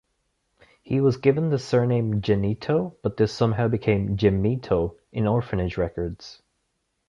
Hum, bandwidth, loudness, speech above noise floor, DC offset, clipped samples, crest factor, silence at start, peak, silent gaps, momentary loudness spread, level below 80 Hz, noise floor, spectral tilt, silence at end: none; 7.6 kHz; -24 LUFS; 52 dB; under 0.1%; under 0.1%; 18 dB; 0.85 s; -6 dBFS; none; 7 LU; -44 dBFS; -75 dBFS; -8 dB/octave; 0.75 s